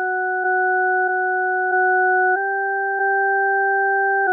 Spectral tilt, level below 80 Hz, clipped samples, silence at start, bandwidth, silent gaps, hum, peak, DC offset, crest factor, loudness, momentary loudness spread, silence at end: -9.5 dB/octave; under -90 dBFS; under 0.1%; 0 s; 1.8 kHz; none; none; -12 dBFS; under 0.1%; 8 dB; -18 LUFS; 4 LU; 0 s